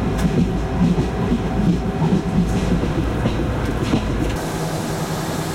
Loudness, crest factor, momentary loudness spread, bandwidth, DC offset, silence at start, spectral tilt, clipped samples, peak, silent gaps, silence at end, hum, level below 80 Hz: -20 LUFS; 14 dB; 5 LU; 16.5 kHz; under 0.1%; 0 s; -6.5 dB/octave; under 0.1%; -6 dBFS; none; 0 s; none; -28 dBFS